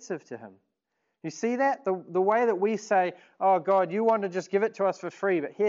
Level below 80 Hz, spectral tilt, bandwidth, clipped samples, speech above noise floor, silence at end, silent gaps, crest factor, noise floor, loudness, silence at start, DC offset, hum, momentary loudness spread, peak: -86 dBFS; -6 dB/octave; 7.6 kHz; under 0.1%; 54 dB; 0 s; none; 16 dB; -80 dBFS; -26 LUFS; 0 s; under 0.1%; none; 13 LU; -12 dBFS